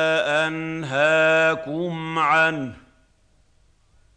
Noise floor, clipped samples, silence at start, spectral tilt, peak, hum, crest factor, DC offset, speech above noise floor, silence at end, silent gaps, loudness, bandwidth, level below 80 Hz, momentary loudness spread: -59 dBFS; under 0.1%; 0 s; -5 dB/octave; -6 dBFS; none; 16 dB; under 0.1%; 38 dB; 1.4 s; none; -20 LUFS; 9.4 kHz; -60 dBFS; 11 LU